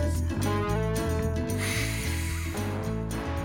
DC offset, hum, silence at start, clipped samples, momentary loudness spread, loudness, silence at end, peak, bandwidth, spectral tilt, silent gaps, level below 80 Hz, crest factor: under 0.1%; none; 0 s; under 0.1%; 4 LU; -29 LUFS; 0 s; -14 dBFS; 18 kHz; -5.5 dB/octave; none; -36 dBFS; 14 dB